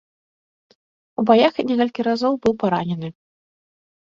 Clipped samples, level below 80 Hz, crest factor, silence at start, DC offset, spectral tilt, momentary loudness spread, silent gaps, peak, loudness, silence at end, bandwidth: under 0.1%; -58 dBFS; 20 dB; 1.2 s; under 0.1%; -7 dB/octave; 14 LU; none; -2 dBFS; -19 LUFS; 0.95 s; 7.4 kHz